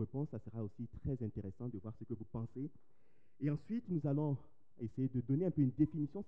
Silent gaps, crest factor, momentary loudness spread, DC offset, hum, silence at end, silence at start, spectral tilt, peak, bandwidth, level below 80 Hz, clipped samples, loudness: none; 18 dB; 12 LU; 0.2%; none; 0 s; 0 s; -12 dB/octave; -20 dBFS; 3.3 kHz; -64 dBFS; under 0.1%; -40 LUFS